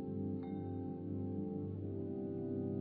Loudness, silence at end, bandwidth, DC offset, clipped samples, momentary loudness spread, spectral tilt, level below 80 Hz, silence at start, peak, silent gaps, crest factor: -42 LUFS; 0 s; 3.9 kHz; under 0.1%; under 0.1%; 2 LU; -12 dB/octave; -72 dBFS; 0 s; -28 dBFS; none; 12 dB